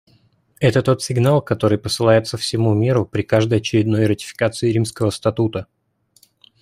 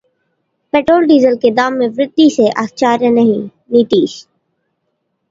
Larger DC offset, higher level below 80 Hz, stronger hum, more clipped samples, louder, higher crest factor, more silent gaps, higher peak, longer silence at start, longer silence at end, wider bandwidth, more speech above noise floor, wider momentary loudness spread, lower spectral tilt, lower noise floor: neither; about the same, -52 dBFS vs -56 dBFS; neither; neither; second, -18 LUFS vs -12 LUFS; about the same, 16 dB vs 12 dB; neither; about the same, -2 dBFS vs 0 dBFS; second, 0.6 s vs 0.75 s; about the same, 1 s vs 1.1 s; first, 15 kHz vs 7.8 kHz; second, 43 dB vs 57 dB; about the same, 5 LU vs 6 LU; about the same, -6 dB/octave vs -5.5 dB/octave; second, -60 dBFS vs -68 dBFS